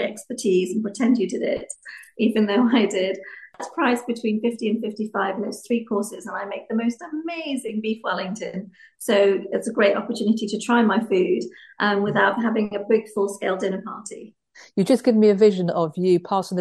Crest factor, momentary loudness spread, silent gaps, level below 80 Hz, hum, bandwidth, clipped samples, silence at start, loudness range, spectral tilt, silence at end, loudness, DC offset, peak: 18 dB; 13 LU; none; -68 dBFS; none; 12.5 kHz; under 0.1%; 0 s; 5 LU; -5.5 dB/octave; 0 s; -22 LUFS; under 0.1%; -4 dBFS